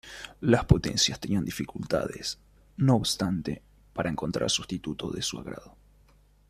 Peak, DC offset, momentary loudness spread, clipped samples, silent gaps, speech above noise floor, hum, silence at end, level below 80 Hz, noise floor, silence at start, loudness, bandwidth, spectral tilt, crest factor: -4 dBFS; under 0.1%; 17 LU; under 0.1%; none; 32 dB; none; 0.85 s; -44 dBFS; -60 dBFS; 0.05 s; -28 LUFS; 15 kHz; -4.5 dB/octave; 26 dB